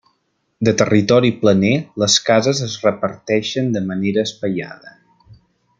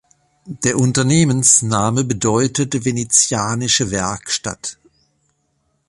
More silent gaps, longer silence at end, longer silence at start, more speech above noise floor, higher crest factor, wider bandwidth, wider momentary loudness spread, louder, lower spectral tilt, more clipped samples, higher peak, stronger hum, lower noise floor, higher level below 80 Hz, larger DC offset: neither; second, 0.45 s vs 1.15 s; first, 0.6 s vs 0.45 s; about the same, 51 dB vs 49 dB; about the same, 16 dB vs 18 dB; second, 9.2 kHz vs 11.5 kHz; about the same, 10 LU vs 10 LU; about the same, -17 LUFS vs -16 LUFS; about the same, -4.5 dB/octave vs -3.5 dB/octave; neither; about the same, -2 dBFS vs 0 dBFS; neither; about the same, -67 dBFS vs -66 dBFS; second, -56 dBFS vs -48 dBFS; neither